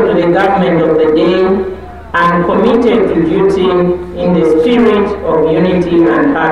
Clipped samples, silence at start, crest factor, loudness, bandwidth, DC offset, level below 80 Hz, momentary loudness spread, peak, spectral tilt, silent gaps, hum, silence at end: under 0.1%; 0 s; 8 dB; -10 LUFS; 10.5 kHz; 0.9%; -34 dBFS; 4 LU; -2 dBFS; -8 dB/octave; none; none; 0 s